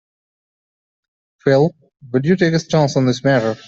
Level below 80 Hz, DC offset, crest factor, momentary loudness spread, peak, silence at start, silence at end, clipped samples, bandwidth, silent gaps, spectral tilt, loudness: -56 dBFS; under 0.1%; 16 dB; 5 LU; -2 dBFS; 1.45 s; 0.1 s; under 0.1%; 7.8 kHz; none; -6.5 dB/octave; -17 LUFS